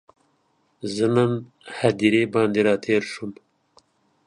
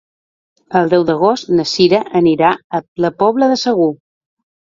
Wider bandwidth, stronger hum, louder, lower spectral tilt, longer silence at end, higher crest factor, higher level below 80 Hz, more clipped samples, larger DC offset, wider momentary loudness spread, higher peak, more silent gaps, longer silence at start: first, 11 kHz vs 7.6 kHz; neither; second, -22 LUFS vs -14 LUFS; about the same, -6 dB/octave vs -5.5 dB/octave; first, 0.95 s vs 0.75 s; first, 20 dB vs 14 dB; second, -64 dBFS vs -54 dBFS; neither; neither; first, 15 LU vs 7 LU; second, -4 dBFS vs 0 dBFS; second, none vs 2.64-2.70 s, 2.88-2.96 s; first, 0.85 s vs 0.7 s